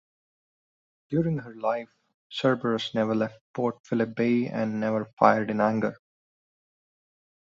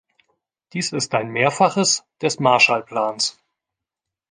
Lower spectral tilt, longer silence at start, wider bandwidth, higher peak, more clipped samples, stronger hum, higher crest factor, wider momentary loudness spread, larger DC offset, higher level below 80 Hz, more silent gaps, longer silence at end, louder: first, -7 dB/octave vs -3 dB/octave; first, 1.1 s vs 0.75 s; second, 7.4 kHz vs 10 kHz; about the same, -2 dBFS vs -2 dBFS; neither; neither; first, 26 dB vs 20 dB; about the same, 9 LU vs 10 LU; neither; about the same, -66 dBFS vs -66 dBFS; first, 2.14-2.30 s, 3.41-3.54 s, 3.80-3.84 s, 5.13-5.17 s vs none; first, 1.65 s vs 1 s; second, -27 LUFS vs -19 LUFS